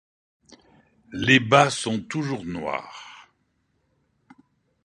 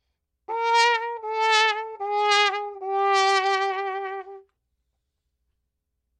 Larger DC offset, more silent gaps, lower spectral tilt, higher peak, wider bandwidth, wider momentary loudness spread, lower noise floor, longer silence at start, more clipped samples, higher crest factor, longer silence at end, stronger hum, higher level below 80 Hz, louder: neither; neither; first, -4.5 dB/octave vs 1.5 dB/octave; first, 0 dBFS vs -4 dBFS; about the same, 11 kHz vs 11.5 kHz; first, 24 LU vs 11 LU; second, -70 dBFS vs -79 dBFS; first, 1.1 s vs 0.5 s; neither; about the same, 26 dB vs 22 dB; second, 1.65 s vs 1.8 s; neither; first, -58 dBFS vs -78 dBFS; about the same, -22 LUFS vs -22 LUFS